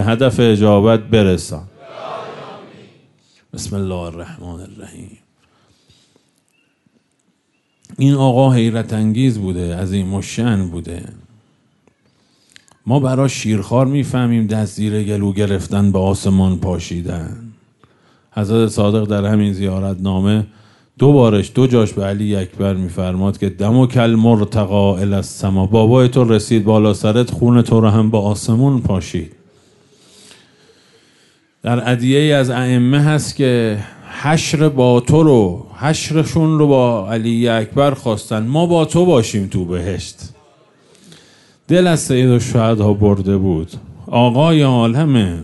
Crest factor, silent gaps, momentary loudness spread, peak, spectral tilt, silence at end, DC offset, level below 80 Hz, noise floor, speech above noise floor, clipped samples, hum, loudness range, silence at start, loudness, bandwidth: 14 dB; none; 16 LU; -2 dBFS; -7 dB/octave; 0 s; under 0.1%; -44 dBFS; -63 dBFS; 50 dB; under 0.1%; none; 9 LU; 0 s; -15 LUFS; 11.5 kHz